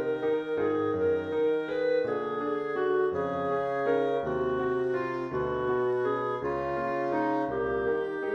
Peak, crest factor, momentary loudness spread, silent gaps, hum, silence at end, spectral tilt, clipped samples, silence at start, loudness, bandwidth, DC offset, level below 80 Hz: -16 dBFS; 12 dB; 3 LU; none; none; 0 s; -8 dB/octave; under 0.1%; 0 s; -29 LUFS; 6.8 kHz; under 0.1%; -58 dBFS